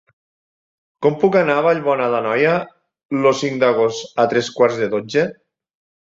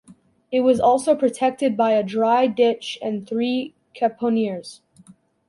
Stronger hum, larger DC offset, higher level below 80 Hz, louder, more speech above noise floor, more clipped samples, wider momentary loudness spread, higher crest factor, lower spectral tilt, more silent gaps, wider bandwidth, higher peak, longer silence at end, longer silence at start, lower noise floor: neither; neither; about the same, -62 dBFS vs -62 dBFS; first, -17 LUFS vs -21 LUFS; first, over 73 dB vs 32 dB; neither; second, 6 LU vs 10 LU; about the same, 18 dB vs 16 dB; about the same, -5.5 dB/octave vs -5.5 dB/octave; first, 3.05-3.09 s vs none; second, 7.8 kHz vs 11.5 kHz; first, 0 dBFS vs -6 dBFS; about the same, 0.7 s vs 0.75 s; first, 1 s vs 0.5 s; first, under -90 dBFS vs -51 dBFS